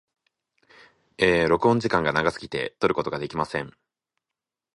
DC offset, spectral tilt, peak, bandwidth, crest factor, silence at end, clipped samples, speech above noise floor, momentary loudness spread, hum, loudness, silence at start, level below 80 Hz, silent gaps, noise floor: under 0.1%; -6 dB/octave; -4 dBFS; 11 kHz; 22 dB; 1.05 s; under 0.1%; 64 dB; 10 LU; none; -24 LUFS; 1.2 s; -52 dBFS; none; -88 dBFS